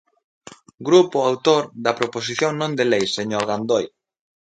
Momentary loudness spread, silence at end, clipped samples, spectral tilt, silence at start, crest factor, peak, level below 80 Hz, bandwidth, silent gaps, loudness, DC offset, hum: 8 LU; 0.7 s; under 0.1%; -4.5 dB/octave; 0.8 s; 20 dB; 0 dBFS; -64 dBFS; 9.2 kHz; none; -20 LUFS; under 0.1%; none